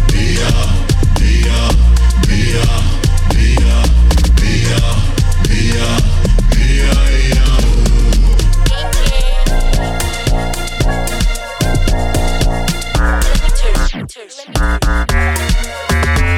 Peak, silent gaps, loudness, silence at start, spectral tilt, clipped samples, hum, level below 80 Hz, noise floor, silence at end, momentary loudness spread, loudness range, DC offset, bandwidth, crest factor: -2 dBFS; none; -14 LUFS; 0 s; -5 dB/octave; under 0.1%; none; -12 dBFS; -31 dBFS; 0 s; 6 LU; 4 LU; under 0.1%; 15 kHz; 8 dB